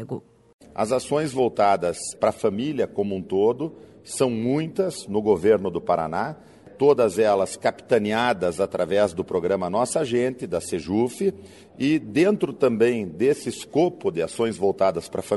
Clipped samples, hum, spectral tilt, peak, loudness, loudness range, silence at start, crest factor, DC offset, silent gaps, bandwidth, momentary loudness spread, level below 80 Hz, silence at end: under 0.1%; none; -5.5 dB/octave; -6 dBFS; -23 LUFS; 2 LU; 0 s; 18 dB; under 0.1%; 0.54-0.59 s; 11.5 kHz; 8 LU; -58 dBFS; 0 s